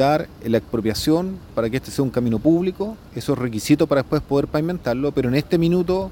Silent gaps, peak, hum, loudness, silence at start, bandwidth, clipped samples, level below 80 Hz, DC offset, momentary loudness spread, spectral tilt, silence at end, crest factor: none; -4 dBFS; none; -21 LUFS; 0 s; 17 kHz; under 0.1%; -42 dBFS; under 0.1%; 7 LU; -6.5 dB/octave; 0 s; 16 dB